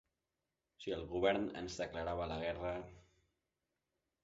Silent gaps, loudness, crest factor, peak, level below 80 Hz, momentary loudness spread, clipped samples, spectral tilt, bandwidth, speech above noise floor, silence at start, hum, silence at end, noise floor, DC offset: none; -40 LUFS; 24 dB; -18 dBFS; -60 dBFS; 11 LU; under 0.1%; -4 dB/octave; 7.6 kHz; 50 dB; 0.8 s; none; 1.25 s; -90 dBFS; under 0.1%